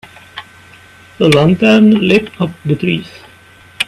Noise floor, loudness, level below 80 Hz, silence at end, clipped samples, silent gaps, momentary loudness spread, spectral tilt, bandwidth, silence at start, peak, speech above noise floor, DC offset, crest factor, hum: -42 dBFS; -11 LUFS; -46 dBFS; 0.05 s; under 0.1%; none; 23 LU; -6.5 dB/octave; 13 kHz; 0.35 s; 0 dBFS; 31 dB; under 0.1%; 14 dB; none